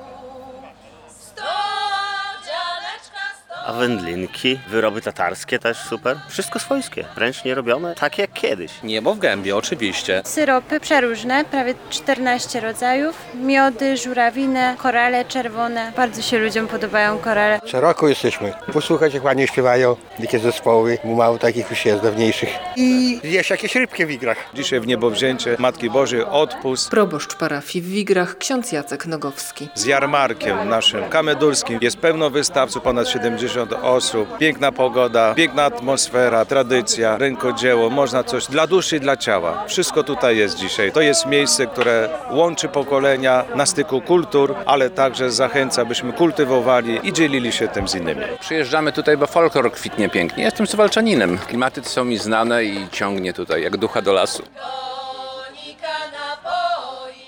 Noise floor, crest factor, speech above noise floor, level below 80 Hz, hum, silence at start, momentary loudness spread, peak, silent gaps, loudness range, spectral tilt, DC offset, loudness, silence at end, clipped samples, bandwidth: -44 dBFS; 16 dB; 26 dB; -54 dBFS; none; 0 s; 9 LU; -2 dBFS; none; 5 LU; -3.5 dB/octave; under 0.1%; -18 LUFS; 0 s; under 0.1%; 19.5 kHz